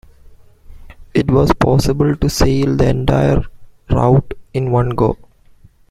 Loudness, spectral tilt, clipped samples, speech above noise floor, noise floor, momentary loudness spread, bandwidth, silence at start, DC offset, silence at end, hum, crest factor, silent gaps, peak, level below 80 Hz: -15 LUFS; -7 dB/octave; under 0.1%; 32 dB; -46 dBFS; 7 LU; 15 kHz; 0.3 s; under 0.1%; 0.65 s; none; 14 dB; none; 0 dBFS; -28 dBFS